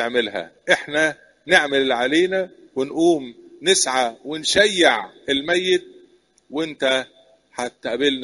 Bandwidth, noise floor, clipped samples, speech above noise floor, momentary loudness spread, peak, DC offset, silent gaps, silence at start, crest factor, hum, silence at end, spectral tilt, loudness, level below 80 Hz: 11.5 kHz; -55 dBFS; under 0.1%; 35 dB; 13 LU; 0 dBFS; under 0.1%; none; 0 s; 20 dB; none; 0 s; -2 dB/octave; -20 LUFS; -60 dBFS